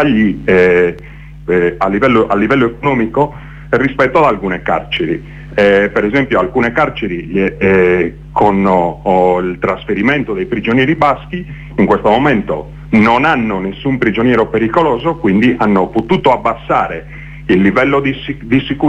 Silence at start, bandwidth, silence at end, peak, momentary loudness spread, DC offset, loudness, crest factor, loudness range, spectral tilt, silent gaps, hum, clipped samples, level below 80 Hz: 0 s; 8.8 kHz; 0 s; 0 dBFS; 8 LU; under 0.1%; -13 LUFS; 12 dB; 1 LU; -7.5 dB/octave; none; none; under 0.1%; -34 dBFS